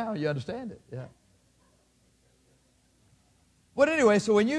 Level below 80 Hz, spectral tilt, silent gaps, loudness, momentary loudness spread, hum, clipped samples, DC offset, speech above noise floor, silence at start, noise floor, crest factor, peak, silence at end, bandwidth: -66 dBFS; -5.5 dB/octave; none; -26 LUFS; 21 LU; none; under 0.1%; under 0.1%; 40 dB; 0 s; -66 dBFS; 20 dB; -8 dBFS; 0 s; 10.5 kHz